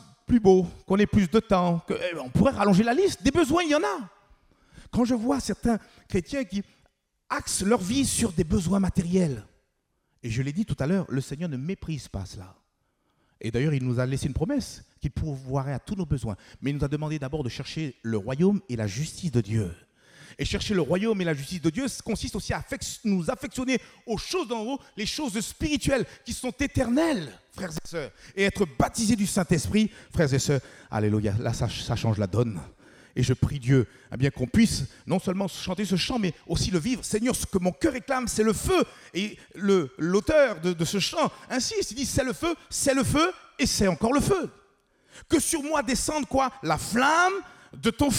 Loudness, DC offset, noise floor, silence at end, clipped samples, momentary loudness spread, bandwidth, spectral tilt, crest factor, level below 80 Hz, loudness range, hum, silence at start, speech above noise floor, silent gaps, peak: -26 LUFS; under 0.1%; -74 dBFS; 0 s; under 0.1%; 10 LU; 16.5 kHz; -5 dB/octave; 18 dB; -44 dBFS; 5 LU; none; 0.3 s; 48 dB; none; -8 dBFS